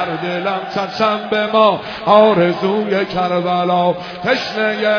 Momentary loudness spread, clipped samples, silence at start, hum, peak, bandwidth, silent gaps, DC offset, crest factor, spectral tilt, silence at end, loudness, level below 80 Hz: 9 LU; under 0.1%; 0 s; none; 0 dBFS; 5.4 kHz; none; under 0.1%; 16 dB; -6.5 dB/octave; 0 s; -16 LUFS; -54 dBFS